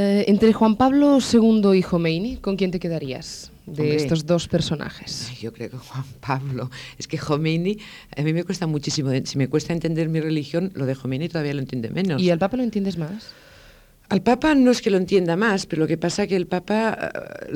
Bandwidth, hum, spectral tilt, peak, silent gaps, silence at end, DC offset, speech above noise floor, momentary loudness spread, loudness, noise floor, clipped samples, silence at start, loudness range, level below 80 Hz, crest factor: 16 kHz; none; -6 dB/octave; -6 dBFS; none; 0 s; under 0.1%; 29 dB; 16 LU; -21 LUFS; -50 dBFS; under 0.1%; 0 s; 7 LU; -48 dBFS; 16 dB